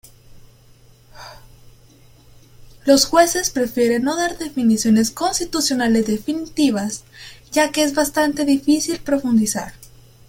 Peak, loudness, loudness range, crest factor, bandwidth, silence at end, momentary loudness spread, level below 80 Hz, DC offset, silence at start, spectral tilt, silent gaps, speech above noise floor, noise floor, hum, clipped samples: -2 dBFS; -18 LUFS; 3 LU; 18 dB; 17 kHz; 0.45 s; 12 LU; -48 dBFS; under 0.1%; 0.3 s; -3.5 dB/octave; none; 31 dB; -49 dBFS; none; under 0.1%